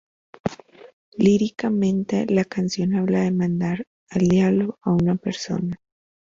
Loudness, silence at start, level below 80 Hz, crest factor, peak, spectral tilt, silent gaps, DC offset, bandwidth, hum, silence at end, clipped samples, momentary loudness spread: -22 LUFS; 0.45 s; -54 dBFS; 16 dB; -6 dBFS; -7 dB/octave; 0.93-1.12 s, 3.87-4.07 s; under 0.1%; 7.6 kHz; none; 0.55 s; under 0.1%; 13 LU